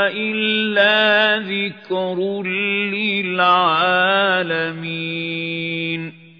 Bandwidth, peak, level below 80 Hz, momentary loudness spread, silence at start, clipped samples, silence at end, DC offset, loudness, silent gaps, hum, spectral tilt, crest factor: 5.4 kHz; -2 dBFS; -72 dBFS; 9 LU; 0 s; under 0.1%; 0.2 s; under 0.1%; -18 LUFS; none; none; -6.5 dB/octave; 16 dB